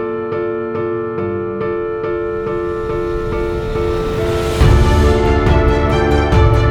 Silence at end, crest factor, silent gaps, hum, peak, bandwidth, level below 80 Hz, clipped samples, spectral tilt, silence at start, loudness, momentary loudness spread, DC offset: 0 s; 14 dB; none; none; 0 dBFS; 14 kHz; -20 dBFS; under 0.1%; -7 dB/octave; 0 s; -16 LUFS; 8 LU; under 0.1%